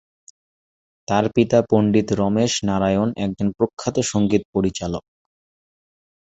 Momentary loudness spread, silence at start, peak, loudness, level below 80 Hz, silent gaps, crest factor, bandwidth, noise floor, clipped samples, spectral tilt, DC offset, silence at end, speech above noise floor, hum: 6 LU; 1.1 s; -2 dBFS; -20 LUFS; -48 dBFS; 3.73-3.77 s, 4.45-4.53 s; 20 dB; 8.2 kHz; under -90 dBFS; under 0.1%; -5.5 dB/octave; under 0.1%; 1.3 s; over 71 dB; none